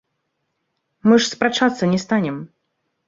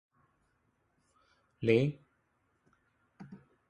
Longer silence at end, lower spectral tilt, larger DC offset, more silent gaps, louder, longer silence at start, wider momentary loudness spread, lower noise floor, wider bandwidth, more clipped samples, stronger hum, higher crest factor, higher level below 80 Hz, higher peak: first, 0.6 s vs 0.35 s; second, -5 dB/octave vs -8 dB/octave; neither; neither; first, -18 LUFS vs -31 LUFS; second, 1.05 s vs 1.6 s; second, 8 LU vs 25 LU; about the same, -74 dBFS vs -76 dBFS; second, 7.8 kHz vs 8.8 kHz; neither; neither; second, 20 dB vs 26 dB; first, -62 dBFS vs -70 dBFS; first, -2 dBFS vs -12 dBFS